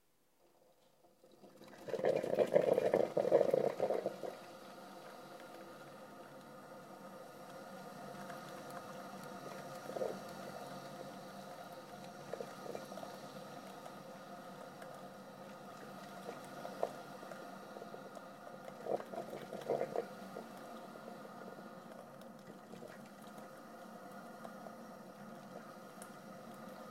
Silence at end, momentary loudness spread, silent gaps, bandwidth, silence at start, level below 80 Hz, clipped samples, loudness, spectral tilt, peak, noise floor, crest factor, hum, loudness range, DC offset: 0 s; 18 LU; none; 16 kHz; 1.05 s; -86 dBFS; under 0.1%; -43 LUFS; -5.5 dB/octave; -14 dBFS; -74 dBFS; 28 dB; none; 17 LU; under 0.1%